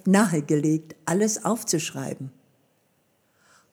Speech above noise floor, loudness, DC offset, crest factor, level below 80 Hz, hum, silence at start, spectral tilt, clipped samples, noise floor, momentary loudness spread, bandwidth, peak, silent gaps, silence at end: 44 dB; -24 LUFS; under 0.1%; 20 dB; -76 dBFS; none; 0.05 s; -5 dB/octave; under 0.1%; -67 dBFS; 13 LU; over 20 kHz; -6 dBFS; none; 1.45 s